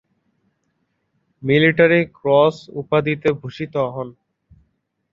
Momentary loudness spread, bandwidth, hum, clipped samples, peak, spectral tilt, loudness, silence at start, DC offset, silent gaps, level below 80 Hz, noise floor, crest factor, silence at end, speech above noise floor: 16 LU; 7.4 kHz; none; under 0.1%; 0 dBFS; -7.5 dB/octave; -18 LUFS; 1.4 s; under 0.1%; none; -58 dBFS; -70 dBFS; 20 dB; 1 s; 52 dB